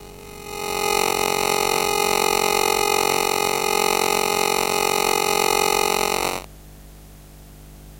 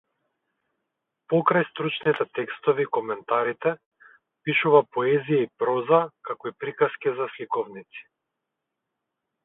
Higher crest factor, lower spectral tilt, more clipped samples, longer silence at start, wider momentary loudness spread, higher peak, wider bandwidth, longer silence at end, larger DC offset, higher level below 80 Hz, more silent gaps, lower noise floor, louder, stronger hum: about the same, 20 dB vs 22 dB; second, -1.5 dB/octave vs -9.5 dB/octave; neither; second, 0 s vs 1.3 s; second, 7 LU vs 13 LU; about the same, -2 dBFS vs -4 dBFS; first, 16 kHz vs 4 kHz; second, 0 s vs 1.45 s; neither; first, -46 dBFS vs -76 dBFS; second, none vs 3.86-3.91 s; second, -43 dBFS vs -83 dBFS; first, -19 LUFS vs -24 LUFS; first, 50 Hz at -50 dBFS vs none